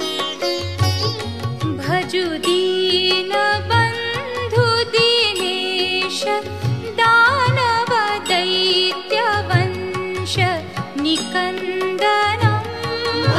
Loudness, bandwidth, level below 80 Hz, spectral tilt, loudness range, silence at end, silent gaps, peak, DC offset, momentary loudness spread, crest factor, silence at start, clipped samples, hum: -18 LUFS; 14.5 kHz; -42 dBFS; -4.5 dB/octave; 3 LU; 0 s; none; -2 dBFS; 0.5%; 9 LU; 16 dB; 0 s; under 0.1%; none